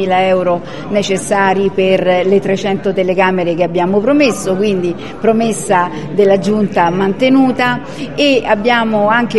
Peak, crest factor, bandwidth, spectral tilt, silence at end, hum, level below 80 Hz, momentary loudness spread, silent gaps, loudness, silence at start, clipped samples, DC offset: 0 dBFS; 12 dB; 12.5 kHz; -5.5 dB/octave; 0 s; none; -44 dBFS; 6 LU; none; -13 LUFS; 0 s; under 0.1%; 2%